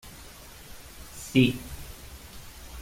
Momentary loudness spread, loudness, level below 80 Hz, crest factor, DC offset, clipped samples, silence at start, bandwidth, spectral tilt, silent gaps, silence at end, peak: 23 LU; -25 LUFS; -48 dBFS; 24 dB; under 0.1%; under 0.1%; 0.05 s; 16.5 kHz; -5.5 dB/octave; none; 0 s; -8 dBFS